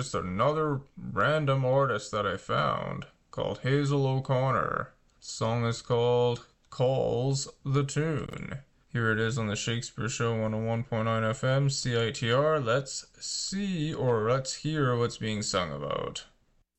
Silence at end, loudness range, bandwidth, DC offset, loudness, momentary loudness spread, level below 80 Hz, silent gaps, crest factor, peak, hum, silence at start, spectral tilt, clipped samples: 0.55 s; 2 LU; 8.6 kHz; under 0.1%; -29 LUFS; 10 LU; -54 dBFS; none; 14 dB; -14 dBFS; none; 0 s; -5 dB/octave; under 0.1%